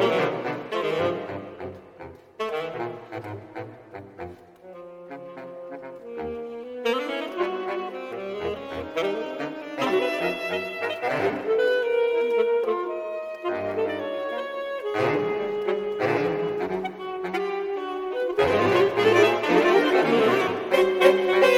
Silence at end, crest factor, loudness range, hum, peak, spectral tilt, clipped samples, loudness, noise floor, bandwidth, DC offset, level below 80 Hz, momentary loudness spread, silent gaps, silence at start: 0 s; 22 dB; 15 LU; none; -4 dBFS; -5.5 dB/octave; under 0.1%; -25 LUFS; -45 dBFS; 16 kHz; under 0.1%; -60 dBFS; 20 LU; none; 0 s